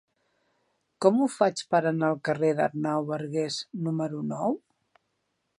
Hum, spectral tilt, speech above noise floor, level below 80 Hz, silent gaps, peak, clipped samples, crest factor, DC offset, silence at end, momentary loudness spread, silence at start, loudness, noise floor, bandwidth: none; -6 dB/octave; 51 dB; -76 dBFS; none; -6 dBFS; under 0.1%; 22 dB; under 0.1%; 1 s; 8 LU; 1 s; -27 LUFS; -77 dBFS; 11.5 kHz